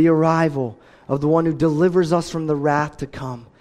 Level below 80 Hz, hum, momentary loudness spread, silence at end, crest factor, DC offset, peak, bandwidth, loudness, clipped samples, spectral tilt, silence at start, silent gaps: -50 dBFS; none; 13 LU; 0.15 s; 14 dB; under 0.1%; -4 dBFS; 11.5 kHz; -19 LUFS; under 0.1%; -7.5 dB/octave; 0 s; none